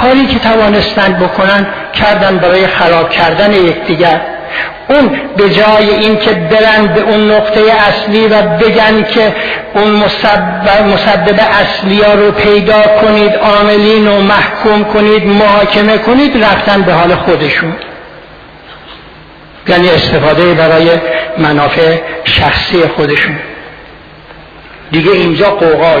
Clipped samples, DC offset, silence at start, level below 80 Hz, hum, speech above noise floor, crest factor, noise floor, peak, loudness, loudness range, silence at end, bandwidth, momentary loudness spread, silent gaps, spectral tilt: 0.4%; under 0.1%; 0 s; -32 dBFS; none; 26 dB; 8 dB; -33 dBFS; 0 dBFS; -7 LUFS; 5 LU; 0 s; 5.4 kHz; 5 LU; none; -7 dB/octave